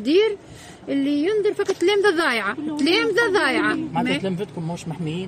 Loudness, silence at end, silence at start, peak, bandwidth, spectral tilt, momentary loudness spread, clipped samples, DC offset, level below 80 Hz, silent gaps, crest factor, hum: -21 LUFS; 0 s; 0 s; -6 dBFS; 14 kHz; -5 dB/octave; 11 LU; under 0.1%; under 0.1%; -60 dBFS; none; 14 dB; none